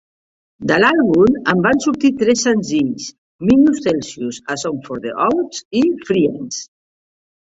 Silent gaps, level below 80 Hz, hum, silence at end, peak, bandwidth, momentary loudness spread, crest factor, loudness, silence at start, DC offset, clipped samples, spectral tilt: 3.18-3.39 s, 5.65-5.71 s; -50 dBFS; none; 0.75 s; -2 dBFS; 8 kHz; 13 LU; 16 dB; -16 LUFS; 0.6 s; under 0.1%; under 0.1%; -5 dB/octave